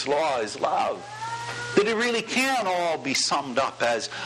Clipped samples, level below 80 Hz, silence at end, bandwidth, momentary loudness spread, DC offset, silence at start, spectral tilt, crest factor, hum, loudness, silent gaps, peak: under 0.1%; -66 dBFS; 0 s; 13.5 kHz; 9 LU; under 0.1%; 0 s; -2.5 dB/octave; 20 dB; none; -25 LUFS; none; -6 dBFS